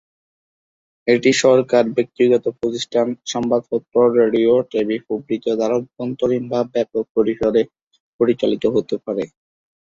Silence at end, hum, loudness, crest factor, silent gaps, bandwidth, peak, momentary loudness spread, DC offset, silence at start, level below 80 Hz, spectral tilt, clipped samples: 0.55 s; none; -18 LUFS; 16 dB; 7.10-7.15 s, 7.82-7.91 s, 8.00-8.19 s; 8 kHz; -2 dBFS; 9 LU; under 0.1%; 1.05 s; -58 dBFS; -5 dB/octave; under 0.1%